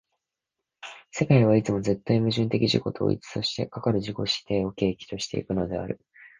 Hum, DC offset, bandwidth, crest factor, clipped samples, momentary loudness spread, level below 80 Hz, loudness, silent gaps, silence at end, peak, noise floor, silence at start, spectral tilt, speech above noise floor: none; under 0.1%; 9.8 kHz; 20 dB; under 0.1%; 13 LU; -52 dBFS; -26 LUFS; none; 0.15 s; -6 dBFS; -86 dBFS; 0.85 s; -6.5 dB/octave; 61 dB